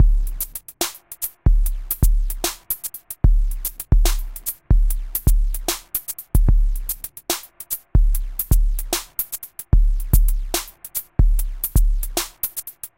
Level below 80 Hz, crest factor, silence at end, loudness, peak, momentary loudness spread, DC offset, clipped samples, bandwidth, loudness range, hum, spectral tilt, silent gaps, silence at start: -20 dBFS; 18 dB; 0.1 s; -23 LUFS; 0 dBFS; 8 LU; under 0.1%; under 0.1%; 17 kHz; 1 LU; none; -4 dB/octave; none; 0 s